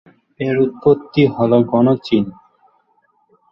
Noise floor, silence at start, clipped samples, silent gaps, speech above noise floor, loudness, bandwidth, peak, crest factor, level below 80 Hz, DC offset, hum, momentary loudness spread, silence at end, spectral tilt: -60 dBFS; 0.4 s; under 0.1%; none; 46 dB; -16 LUFS; 6.6 kHz; -2 dBFS; 16 dB; -52 dBFS; under 0.1%; none; 7 LU; 1.2 s; -9.5 dB/octave